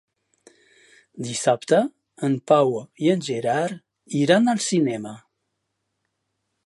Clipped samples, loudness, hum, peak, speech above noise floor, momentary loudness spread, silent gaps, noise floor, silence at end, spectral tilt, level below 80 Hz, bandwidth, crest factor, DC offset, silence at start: under 0.1%; -22 LUFS; none; -2 dBFS; 56 dB; 12 LU; none; -77 dBFS; 1.45 s; -5 dB/octave; -72 dBFS; 11.5 kHz; 22 dB; under 0.1%; 1.15 s